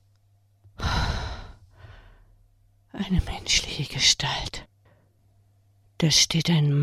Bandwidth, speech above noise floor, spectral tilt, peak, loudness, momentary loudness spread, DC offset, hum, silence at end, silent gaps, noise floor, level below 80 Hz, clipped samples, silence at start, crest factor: 15.5 kHz; 39 dB; -3 dB/octave; -6 dBFS; -23 LUFS; 17 LU; under 0.1%; none; 0 s; none; -62 dBFS; -38 dBFS; under 0.1%; 0.8 s; 20 dB